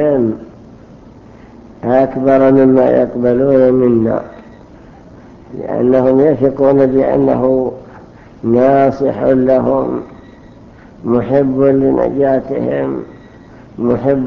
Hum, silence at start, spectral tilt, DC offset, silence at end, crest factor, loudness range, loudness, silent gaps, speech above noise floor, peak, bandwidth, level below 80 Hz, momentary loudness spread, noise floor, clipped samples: none; 0 s; -10 dB/octave; under 0.1%; 0 s; 14 dB; 3 LU; -12 LUFS; none; 27 dB; 0 dBFS; 6.2 kHz; -42 dBFS; 14 LU; -38 dBFS; under 0.1%